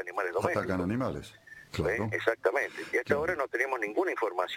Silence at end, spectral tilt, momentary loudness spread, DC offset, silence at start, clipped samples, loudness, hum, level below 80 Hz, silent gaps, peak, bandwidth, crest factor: 0 s; -6 dB/octave; 7 LU; under 0.1%; 0 s; under 0.1%; -30 LUFS; none; -56 dBFS; none; -10 dBFS; 16.5 kHz; 20 dB